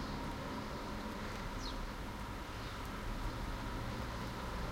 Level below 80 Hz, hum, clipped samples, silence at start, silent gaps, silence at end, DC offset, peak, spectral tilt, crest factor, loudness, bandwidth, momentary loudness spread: -46 dBFS; none; under 0.1%; 0 s; none; 0 s; under 0.1%; -28 dBFS; -5 dB/octave; 14 dB; -43 LUFS; 16 kHz; 2 LU